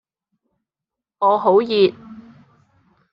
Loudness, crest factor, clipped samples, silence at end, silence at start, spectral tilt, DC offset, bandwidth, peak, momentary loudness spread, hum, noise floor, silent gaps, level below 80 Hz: -17 LUFS; 18 dB; under 0.1%; 0.95 s; 1.2 s; -3.5 dB/octave; under 0.1%; 5.4 kHz; -2 dBFS; 4 LU; none; -86 dBFS; none; -66 dBFS